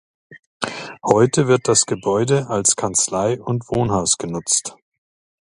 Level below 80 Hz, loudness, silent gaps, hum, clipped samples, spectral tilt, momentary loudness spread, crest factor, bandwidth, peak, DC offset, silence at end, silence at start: -50 dBFS; -18 LUFS; 0.39-0.60 s; none; under 0.1%; -4 dB/octave; 12 LU; 20 dB; 11.5 kHz; 0 dBFS; under 0.1%; 0.75 s; 0.3 s